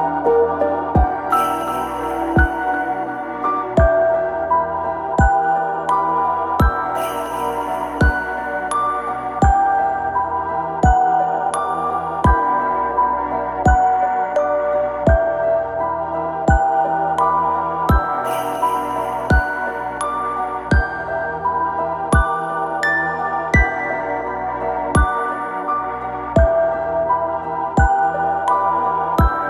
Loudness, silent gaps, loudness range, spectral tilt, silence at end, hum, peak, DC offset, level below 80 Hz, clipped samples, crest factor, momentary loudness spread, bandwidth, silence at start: -18 LUFS; none; 2 LU; -7 dB/octave; 0 s; none; -2 dBFS; under 0.1%; -26 dBFS; under 0.1%; 16 dB; 7 LU; 14.5 kHz; 0 s